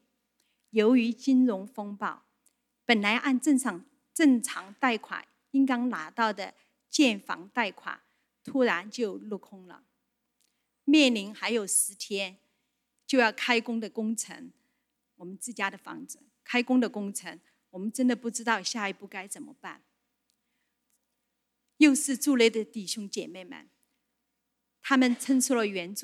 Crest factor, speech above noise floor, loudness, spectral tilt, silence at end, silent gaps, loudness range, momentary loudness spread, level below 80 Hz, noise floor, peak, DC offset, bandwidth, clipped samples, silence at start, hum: 22 dB; 54 dB; -27 LUFS; -3 dB/octave; 0 s; none; 6 LU; 18 LU; -86 dBFS; -81 dBFS; -6 dBFS; under 0.1%; 15 kHz; under 0.1%; 0.75 s; none